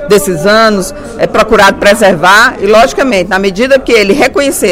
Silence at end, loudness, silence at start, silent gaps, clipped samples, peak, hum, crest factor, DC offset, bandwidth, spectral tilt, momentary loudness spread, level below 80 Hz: 0 s; -7 LUFS; 0 s; none; 4%; 0 dBFS; none; 6 dB; under 0.1%; 17 kHz; -3.5 dB/octave; 6 LU; -30 dBFS